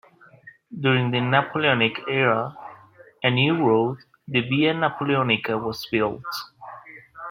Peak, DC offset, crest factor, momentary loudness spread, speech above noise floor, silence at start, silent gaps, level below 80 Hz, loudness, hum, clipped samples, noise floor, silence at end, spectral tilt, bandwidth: -2 dBFS; under 0.1%; 20 dB; 20 LU; 28 dB; 0.45 s; none; -62 dBFS; -22 LUFS; none; under 0.1%; -50 dBFS; 0 s; -6.5 dB/octave; 16 kHz